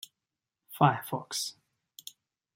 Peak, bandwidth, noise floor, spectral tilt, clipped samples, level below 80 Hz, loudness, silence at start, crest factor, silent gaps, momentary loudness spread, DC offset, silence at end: -8 dBFS; 16.5 kHz; -89 dBFS; -4.5 dB/octave; under 0.1%; -78 dBFS; -30 LUFS; 0.7 s; 26 dB; none; 22 LU; under 0.1%; 1.05 s